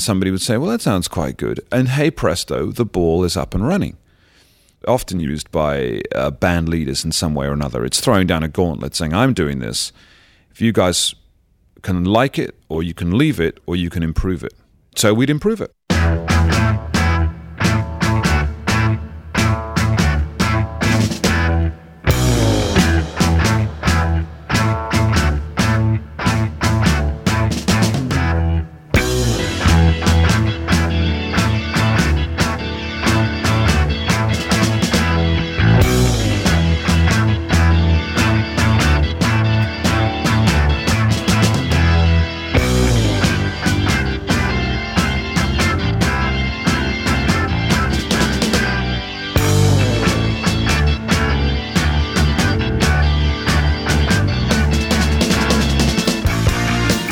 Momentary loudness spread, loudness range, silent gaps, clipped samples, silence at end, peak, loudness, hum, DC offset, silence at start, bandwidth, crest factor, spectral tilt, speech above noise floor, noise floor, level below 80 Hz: 6 LU; 4 LU; none; under 0.1%; 0 s; 0 dBFS; -17 LUFS; none; under 0.1%; 0 s; 17 kHz; 16 dB; -5 dB/octave; 38 dB; -56 dBFS; -24 dBFS